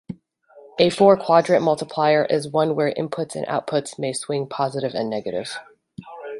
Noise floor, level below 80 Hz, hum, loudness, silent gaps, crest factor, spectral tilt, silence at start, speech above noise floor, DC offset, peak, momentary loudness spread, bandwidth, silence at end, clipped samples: -51 dBFS; -64 dBFS; none; -21 LUFS; none; 20 dB; -5 dB/octave; 0.1 s; 30 dB; under 0.1%; -2 dBFS; 18 LU; 11.5 kHz; 0 s; under 0.1%